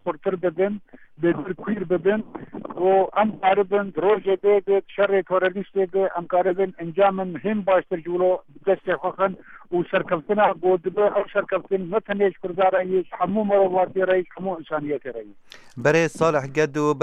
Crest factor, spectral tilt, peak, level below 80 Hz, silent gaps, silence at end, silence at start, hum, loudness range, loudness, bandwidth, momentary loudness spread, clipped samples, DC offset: 16 dB; -6.5 dB/octave; -6 dBFS; -62 dBFS; none; 0 s; 0.05 s; none; 2 LU; -22 LUFS; 10 kHz; 8 LU; under 0.1%; under 0.1%